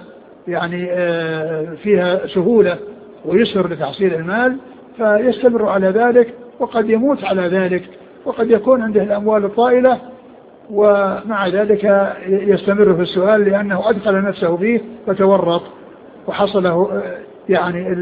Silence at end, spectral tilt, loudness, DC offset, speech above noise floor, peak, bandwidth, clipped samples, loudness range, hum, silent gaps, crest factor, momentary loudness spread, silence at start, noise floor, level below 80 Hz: 0 s; -10 dB/octave; -16 LUFS; under 0.1%; 26 dB; 0 dBFS; 4.9 kHz; under 0.1%; 2 LU; none; none; 16 dB; 10 LU; 0 s; -41 dBFS; -54 dBFS